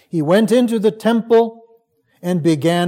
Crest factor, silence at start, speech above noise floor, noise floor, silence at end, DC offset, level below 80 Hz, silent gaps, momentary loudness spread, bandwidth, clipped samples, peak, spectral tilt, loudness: 14 dB; 0.15 s; 42 dB; -57 dBFS; 0 s; under 0.1%; -68 dBFS; none; 9 LU; 16.5 kHz; under 0.1%; -2 dBFS; -6.5 dB/octave; -16 LUFS